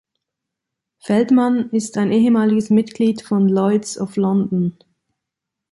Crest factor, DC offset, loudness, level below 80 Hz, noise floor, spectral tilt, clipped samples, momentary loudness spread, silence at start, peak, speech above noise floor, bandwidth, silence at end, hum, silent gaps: 14 dB; under 0.1%; -17 LUFS; -62 dBFS; -82 dBFS; -7 dB/octave; under 0.1%; 7 LU; 1.05 s; -4 dBFS; 66 dB; 11.5 kHz; 1 s; none; none